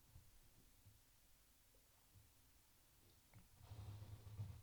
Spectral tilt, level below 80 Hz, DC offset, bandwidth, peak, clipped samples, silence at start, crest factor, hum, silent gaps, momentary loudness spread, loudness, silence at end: -5 dB/octave; -72 dBFS; under 0.1%; over 20 kHz; -40 dBFS; under 0.1%; 0 s; 20 dB; none; none; 13 LU; -60 LUFS; 0 s